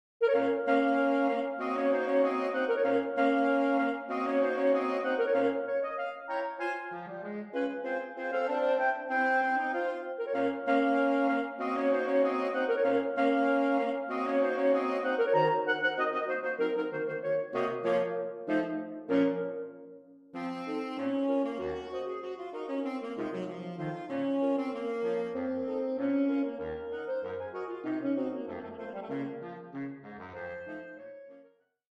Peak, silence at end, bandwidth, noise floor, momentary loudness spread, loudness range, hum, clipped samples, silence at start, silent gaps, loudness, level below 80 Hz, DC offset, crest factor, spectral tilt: -16 dBFS; 0.6 s; 8.2 kHz; -62 dBFS; 13 LU; 7 LU; none; under 0.1%; 0.2 s; none; -31 LUFS; -72 dBFS; under 0.1%; 16 dB; -7 dB/octave